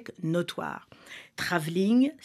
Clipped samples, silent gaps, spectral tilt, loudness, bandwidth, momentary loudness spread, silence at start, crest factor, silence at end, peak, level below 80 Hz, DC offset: under 0.1%; none; -6 dB/octave; -28 LUFS; 14.5 kHz; 20 LU; 0 s; 20 dB; 0.1 s; -10 dBFS; -70 dBFS; under 0.1%